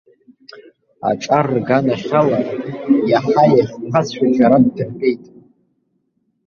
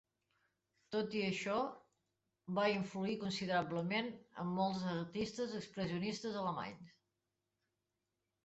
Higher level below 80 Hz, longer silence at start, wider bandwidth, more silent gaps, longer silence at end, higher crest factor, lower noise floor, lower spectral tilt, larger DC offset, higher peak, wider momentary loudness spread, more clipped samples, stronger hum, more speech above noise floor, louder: first, -56 dBFS vs -76 dBFS; second, 0.55 s vs 0.9 s; second, 7 kHz vs 8 kHz; neither; second, 1.3 s vs 1.55 s; about the same, 16 dB vs 20 dB; second, -66 dBFS vs -89 dBFS; first, -7.5 dB/octave vs -4.5 dB/octave; neither; first, -2 dBFS vs -22 dBFS; about the same, 9 LU vs 8 LU; neither; neither; about the same, 51 dB vs 49 dB; first, -16 LUFS vs -40 LUFS